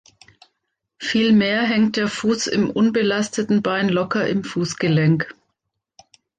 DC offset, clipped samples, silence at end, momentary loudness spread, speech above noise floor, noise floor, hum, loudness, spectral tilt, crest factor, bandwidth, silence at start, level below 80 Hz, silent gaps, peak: under 0.1%; under 0.1%; 1.05 s; 7 LU; 58 dB; -76 dBFS; none; -19 LUFS; -5.5 dB/octave; 14 dB; 9.4 kHz; 1 s; -60 dBFS; none; -6 dBFS